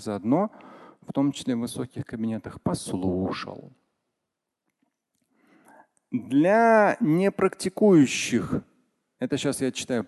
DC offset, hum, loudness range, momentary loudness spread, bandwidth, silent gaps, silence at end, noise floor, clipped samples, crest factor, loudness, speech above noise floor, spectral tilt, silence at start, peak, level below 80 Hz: under 0.1%; none; 12 LU; 15 LU; 12.5 kHz; none; 0 s; -84 dBFS; under 0.1%; 18 dB; -24 LUFS; 60 dB; -5.5 dB/octave; 0 s; -8 dBFS; -56 dBFS